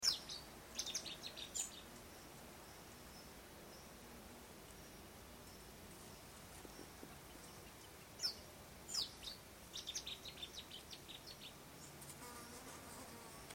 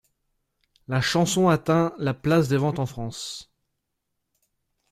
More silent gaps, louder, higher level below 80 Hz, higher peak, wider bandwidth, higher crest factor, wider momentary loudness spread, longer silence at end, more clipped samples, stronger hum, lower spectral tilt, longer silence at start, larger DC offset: neither; second, -50 LUFS vs -23 LUFS; second, -68 dBFS vs -56 dBFS; second, -22 dBFS vs -6 dBFS; about the same, 16.5 kHz vs 15 kHz; first, 28 dB vs 20 dB; about the same, 13 LU vs 13 LU; second, 0 s vs 1.5 s; neither; neither; second, -1.5 dB/octave vs -5.5 dB/octave; second, 0 s vs 0.9 s; neither